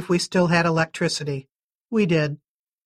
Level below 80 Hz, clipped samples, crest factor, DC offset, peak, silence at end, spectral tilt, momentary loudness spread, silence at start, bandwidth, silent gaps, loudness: -58 dBFS; under 0.1%; 18 dB; under 0.1%; -6 dBFS; 0.5 s; -5.5 dB/octave; 11 LU; 0 s; 12.5 kHz; 1.51-1.84 s; -22 LUFS